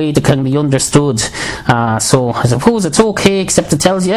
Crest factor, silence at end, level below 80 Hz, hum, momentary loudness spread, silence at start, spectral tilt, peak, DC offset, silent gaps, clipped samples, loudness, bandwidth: 12 dB; 0 s; -36 dBFS; none; 4 LU; 0 s; -5 dB/octave; 0 dBFS; under 0.1%; none; 0.4%; -12 LUFS; 15.5 kHz